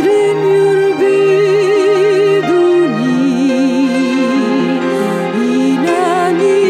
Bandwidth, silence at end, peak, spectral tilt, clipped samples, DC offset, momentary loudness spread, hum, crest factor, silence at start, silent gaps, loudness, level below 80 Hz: 11.5 kHz; 0 s; -2 dBFS; -6 dB/octave; under 0.1%; under 0.1%; 4 LU; none; 8 dB; 0 s; none; -12 LUFS; -62 dBFS